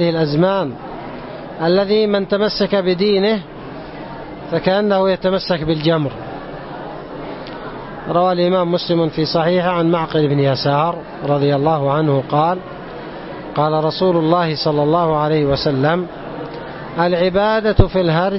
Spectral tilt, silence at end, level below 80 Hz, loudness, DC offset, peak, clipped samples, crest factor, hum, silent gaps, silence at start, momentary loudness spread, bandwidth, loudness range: -10 dB/octave; 0 s; -36 dBFS; -16 LUFS; under 0.1%; 0 dBFS; under 0.1%; 16 dB; none; none; 0 s; 15 LU; 6 kHz; 3 LU